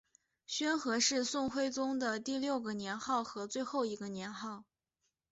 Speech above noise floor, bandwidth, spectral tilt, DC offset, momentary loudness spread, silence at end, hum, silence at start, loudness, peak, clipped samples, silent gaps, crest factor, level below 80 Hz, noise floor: 49 dB; 8 kHz; -2 dB/octave; under 0.1%; 11 LU; 0.7 s; none; 0.5 s; -36 LUFS; -18 dBFS; under 0.1%; none; 18 dB; -76 dBFS; -85 dBFS